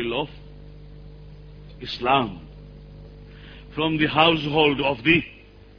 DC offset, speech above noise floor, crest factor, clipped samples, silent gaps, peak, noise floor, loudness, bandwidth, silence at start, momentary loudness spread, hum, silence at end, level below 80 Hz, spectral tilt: under 0.1%; 21 dB; 22 dB; under 0.1%; none; -2 dBFS; -42 dBFS; -21 LUFS; 5.4 kHz; 0 s; 21 LU; 50 Hz at -45 dBFS; 0.45 s; -46 dBFS; -7 dB/octave